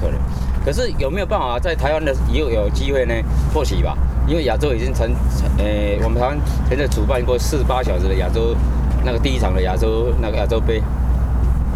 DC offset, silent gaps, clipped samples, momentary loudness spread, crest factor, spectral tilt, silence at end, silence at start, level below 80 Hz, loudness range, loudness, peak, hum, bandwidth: under 0.1%; none; under 0.1%; 2 LU; 14 dB; -6.5 dB/octave; 0 s; 0 s; -18 dBFS; 1 LU; -19 LUFS; -4 dBFS; none; 13.5 kHz